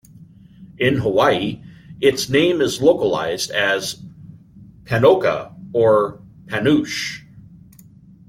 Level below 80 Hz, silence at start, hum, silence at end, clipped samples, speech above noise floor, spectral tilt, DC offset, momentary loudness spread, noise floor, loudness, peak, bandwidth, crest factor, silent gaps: -52 dBFS; 0.2 s; none; 0.9 s; under 0.1%; 28 dB; -5 dB/octave; under 0.1%; 12 LU; -46 dBFS; -18 LUFS; -2 dBFS; 16.5 kHz; 18 dB; none